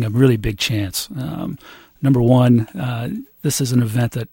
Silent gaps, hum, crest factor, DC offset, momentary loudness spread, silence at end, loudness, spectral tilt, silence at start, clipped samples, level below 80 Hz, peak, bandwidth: none; none; 16 dB; under 0.1%; 13 LU; 0.05 s; -18 LUFS; -6 dB/octave; 0 s; under 0.1%; -40 dBFS; -2 dBFS; 16.5 kHz